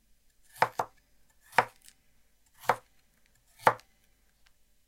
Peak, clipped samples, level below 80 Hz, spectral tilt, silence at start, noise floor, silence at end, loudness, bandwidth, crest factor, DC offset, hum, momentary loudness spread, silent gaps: -6 dBFS; under 0.1%; -70 dBFS; -3.5 dB/octave; 0.6 s; -67 dBFS; 1.1 s; -31 LUFS; 16.5 kHz; 30 dB; under 0.1%; none; 12 LU; none